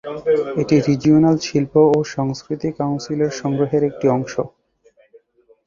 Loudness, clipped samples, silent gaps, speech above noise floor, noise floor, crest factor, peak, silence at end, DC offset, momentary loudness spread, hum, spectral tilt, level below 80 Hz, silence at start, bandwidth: -18 LUFS; under 0.1%; none; 38 dB; -56 dBFS; 16 dB; -2 dBFS; 1.2 s; under 0.1%; 10 LU; none; -7 dB/octave; -52 dBFS; 0.05 s; 7.4 kHz